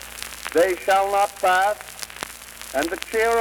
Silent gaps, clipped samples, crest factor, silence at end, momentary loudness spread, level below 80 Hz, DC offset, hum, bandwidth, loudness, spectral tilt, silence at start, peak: none; under 0.1%; 16 dB; 0 s; 15 LU; -52 dBFS; under 0.1%; none; over 20 kHz; -22 LUFS; -2 dB/octave; 0 s; -6 dBFS